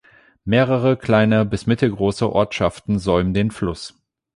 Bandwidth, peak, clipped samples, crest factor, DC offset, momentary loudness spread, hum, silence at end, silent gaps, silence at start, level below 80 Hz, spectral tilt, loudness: 11.5 kHz; -2 dBFS; under 0.1%; 16 dB; under 0.1%; 10 LU; none; 0.45 s; none; 0.45 s; -40 dBFS; -7 dB/octave; -19 LUFS